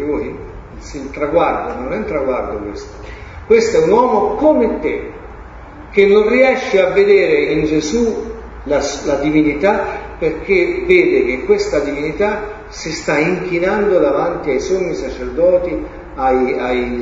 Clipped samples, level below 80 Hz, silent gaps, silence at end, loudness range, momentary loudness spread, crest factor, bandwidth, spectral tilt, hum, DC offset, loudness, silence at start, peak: under 0.1%; -36 dBFS; none; 0 s; 3 LU; 18 LU; 16 dB; 7.8 kHz; -5.5 dB/octave; none; under 0.1%; -15 LUFS; 0 s; 0 dBFS